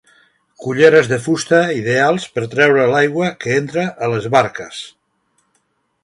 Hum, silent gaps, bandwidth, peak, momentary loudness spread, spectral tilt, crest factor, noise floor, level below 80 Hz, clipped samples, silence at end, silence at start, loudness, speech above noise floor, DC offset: none; none; 11.5 kHz; 0 dBFS; 15 LU; -5 dB/octave; 16 dB; -65 dBFS; -58 dBFS; under 0.1%; 1.15 s; 0.6 s; -15 LUFS; 50 dB; under 0.1%